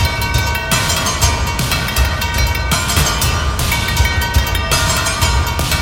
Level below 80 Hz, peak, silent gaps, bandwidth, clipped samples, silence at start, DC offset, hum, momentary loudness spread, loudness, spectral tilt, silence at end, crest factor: -20 dBFS; 0 dBFS; none; 17 kHz; under 0.1%; 0 s; under 0.1%; none; 3 LU; -15 LUFS; -3 dB/octave; 0 s; 16 dB